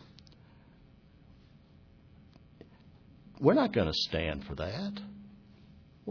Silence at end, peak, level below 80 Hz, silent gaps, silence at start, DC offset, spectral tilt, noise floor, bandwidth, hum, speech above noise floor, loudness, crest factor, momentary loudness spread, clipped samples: 0 s; -10 dBFS; -54 dBFS; none; 2.6 s; under 0.1%; -4.5 dB/octave; -59 dBFS; 5.4 kHz; none; 28 dB; -31 LUFS; 24 dB; 25 LU; under 0.1%